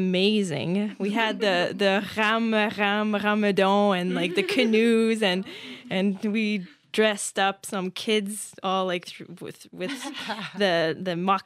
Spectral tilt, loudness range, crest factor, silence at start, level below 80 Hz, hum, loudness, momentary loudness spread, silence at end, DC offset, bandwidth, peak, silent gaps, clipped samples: -4.5 dB/octave; 6 LU; 18 dB; 0 s; -72 dBFS; none; -24 LUFS; 11 LU; 0.05 s; under 0.1%; 14 kHz; -6 dBFS; none; under 0.1%